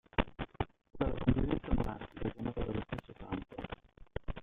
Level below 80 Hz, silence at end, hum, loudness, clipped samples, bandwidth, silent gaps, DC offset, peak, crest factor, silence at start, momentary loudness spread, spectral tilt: -44 dBFS; 0 s; none; -38 LUFS; under 0.1%; 5 kHz; none; under 0.1%; -12 dBFS; 24 dB; 0.2 s; 13 LU; -9 dB/octave